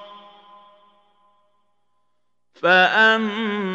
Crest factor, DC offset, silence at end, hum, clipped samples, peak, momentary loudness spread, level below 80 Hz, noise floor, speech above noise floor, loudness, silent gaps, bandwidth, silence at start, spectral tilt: 20 dB; under 0.1%; 0 s; 60 Hz at -60 dBFS; under 0.1%; -2 dBFS; 10 LU; -84 dBFS; -76 dBFS; 59 dB; -17 LUFS; none; 8 kHz; 0 s; -4.5 dB/octave